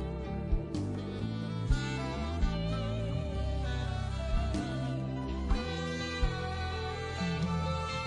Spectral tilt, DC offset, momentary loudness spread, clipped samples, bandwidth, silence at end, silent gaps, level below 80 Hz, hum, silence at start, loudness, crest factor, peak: -6.5 dB/octave; under 0.1%; 4 LU; under 0.1%; 10.5 kHz; 0 s; none; -38 dBFS; none; 0 s; -35 LUFS; 18 dB; -16 dBFS